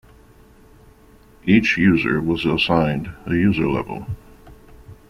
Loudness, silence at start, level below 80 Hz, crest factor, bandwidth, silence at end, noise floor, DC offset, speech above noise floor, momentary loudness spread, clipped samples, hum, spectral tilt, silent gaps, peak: -19 LUFS; 1.45 s; -44 dBFS; 18 dB; 12 kHz; 0.15 s; -49 dBFS; under 0.1%; 31 dB; 14 LU; under 0.1%; none; -7 dB/octave; none; -2 dBFS